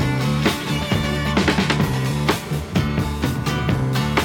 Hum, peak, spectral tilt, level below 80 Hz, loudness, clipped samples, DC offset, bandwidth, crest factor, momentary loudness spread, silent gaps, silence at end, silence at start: none; -4 dBFS; -5.5 dB/octave; -32 dBFS; -21 LUFS; under 0.1%; under 0.1%; 18 kHz; 16 dB; 4 LU; none; 0 s; 0 s